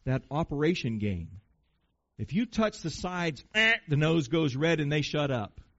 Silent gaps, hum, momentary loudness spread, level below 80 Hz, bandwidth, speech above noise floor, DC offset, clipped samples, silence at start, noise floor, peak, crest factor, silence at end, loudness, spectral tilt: none; none; 10 LU; -52 dBFS; 8 kHz; 46 dB; under 0.1%; under 0.1%; 0.05 s; -75 dBFS; -12 dBFS; 18 dB; 0.3 s; -29 LUFS; -4.5 dB/octave